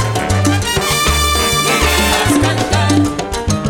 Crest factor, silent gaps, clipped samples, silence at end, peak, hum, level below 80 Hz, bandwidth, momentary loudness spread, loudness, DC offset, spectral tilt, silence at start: 14 dB; none; under 0.1%; 0 s; 0 dBFS; none; -24 dBFS; over 20 kHz; 4 LU; -13 LUFS; under 0.1%; -4 dB/octave; 0 s